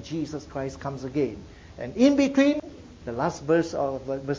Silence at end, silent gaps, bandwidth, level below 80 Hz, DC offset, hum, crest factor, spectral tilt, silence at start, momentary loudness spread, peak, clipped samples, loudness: 0 s; none; 7.6 kHz; -50 dBFS; under 0.1%; none; 18 dB; -6 dB/octave; 0 s; 18 LU; -8 dBFS; under 0.1%; -26 LUFS